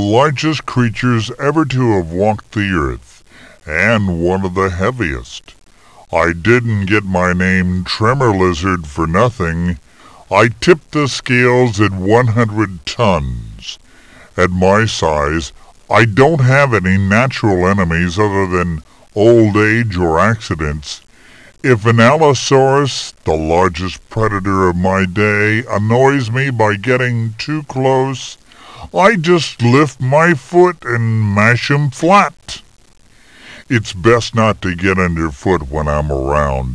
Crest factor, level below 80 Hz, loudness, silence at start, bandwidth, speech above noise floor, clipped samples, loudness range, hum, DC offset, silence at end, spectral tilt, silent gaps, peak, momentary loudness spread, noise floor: 14 dB; -34 dBFS; -13 LUFS; 0 s; 11 kHz; 29 dB; under 0.1%; 4 LU; none; 0.4%; 0 s; -6 dB/octave; none; 0 dBFS; 10 LU; -42 dBFS